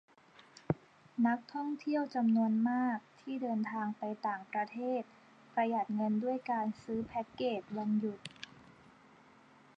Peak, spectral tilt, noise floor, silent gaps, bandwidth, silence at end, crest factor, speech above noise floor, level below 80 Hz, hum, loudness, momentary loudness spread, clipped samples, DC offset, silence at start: -16 dBFS; -7.5 dB/octave; -62 dBFS; none; 8.8 kHz; 1.35 s; 20 dB; 27 dB; -74 dBFS; none; -35 LUFS; 10 LU; under 0.1%; under 0.1%; 0.7 s